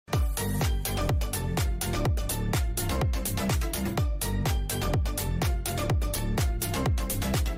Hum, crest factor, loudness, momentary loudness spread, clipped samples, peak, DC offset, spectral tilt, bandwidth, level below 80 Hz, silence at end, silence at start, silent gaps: none; 10 dB; -29 LUFS; 1 LU; under 0.1%; -16 dBFS; under 0.1%; -5 dB/octave; 16.5 kHz; -32 dBFS; 0 s; 0.1 s; none